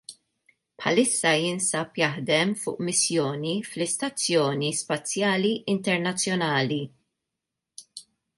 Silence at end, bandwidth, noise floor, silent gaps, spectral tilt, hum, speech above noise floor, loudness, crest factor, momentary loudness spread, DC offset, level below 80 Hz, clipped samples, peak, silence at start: 0.35 s; 11.5 kHz; -85 dBFS; none; -3.5 dB/octave; none; 60 dB; -25 LUFS; 20 dB; 9 LU; under 0.1%; -72 dBFS; under 0.1%; -8 dBFS; 0.1 s